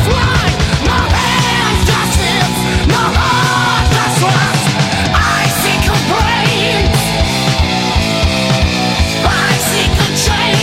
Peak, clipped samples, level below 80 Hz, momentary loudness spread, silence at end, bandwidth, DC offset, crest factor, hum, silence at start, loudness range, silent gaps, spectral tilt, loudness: 0 dBFS; under 0.1%; -20 dBFS; 2 LU; 0 s; 16.5 kHz; 0.3%; 12 dB; none; 0 s; 1 LU; none; -4 dB/octave; -12 LUFS